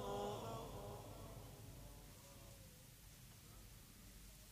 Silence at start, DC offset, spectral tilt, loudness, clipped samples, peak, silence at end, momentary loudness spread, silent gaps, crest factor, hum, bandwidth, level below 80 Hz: 0 s; under 0.1%; -5 dB/octave; -55 LUFS; under 0.1%; -34 dBFS; 0 s; 13 LU; none; 20 dB; none; 15.5 kHz; -64 dBFS